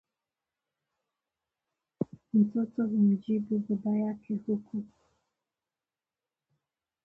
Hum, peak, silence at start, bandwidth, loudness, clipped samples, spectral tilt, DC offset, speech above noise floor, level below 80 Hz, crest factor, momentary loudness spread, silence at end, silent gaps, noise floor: none; -16 dBFS; 2 s; 3.3 kHz; -30 LUFS; under 0.1%; -11.5 dB/octave; under 0.1%; over 61 dB; -74 dBFS; 18 dB; 12 LU; 2.2 s; none; under -90 dBFS